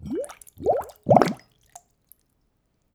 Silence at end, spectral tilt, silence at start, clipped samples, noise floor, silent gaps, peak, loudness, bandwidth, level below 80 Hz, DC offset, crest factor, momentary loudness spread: 1.6 s; -7 dB/octave; 0 s; under 0.1%; -70 dBFS; none; 0 dBFS; -23 LUFS; 18 kHz; -58 dBFS; under 0.1%; 26 dB; 17 LU